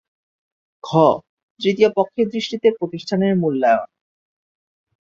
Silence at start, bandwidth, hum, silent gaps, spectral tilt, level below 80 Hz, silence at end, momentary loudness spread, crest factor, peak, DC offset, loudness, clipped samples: 0.85 s; 7.6 kHz; none; 1.29-1.37 s, 1.43-1.56 s; -6.5 dB/octave; -64 dBFS; 1.2 s; 10 LU; 18 dB; -2 dBFS; under 0.1%; -19 LUFS; under 0.1%